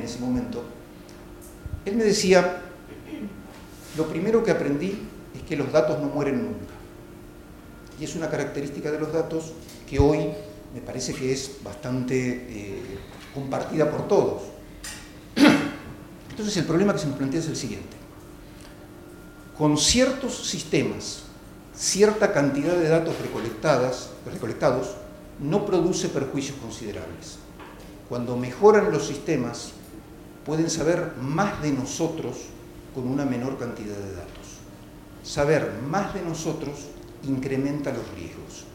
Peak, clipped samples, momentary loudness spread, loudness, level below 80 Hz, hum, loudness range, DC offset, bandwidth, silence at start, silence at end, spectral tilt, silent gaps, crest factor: -4 dBFS; under 0.1%; 23 LU; -25 LUFS; -48 dBFS; none; 5 LU; under 0.1%; 17 kHz; 0 s; 0 s; -5 dB/octave; none; 22 dB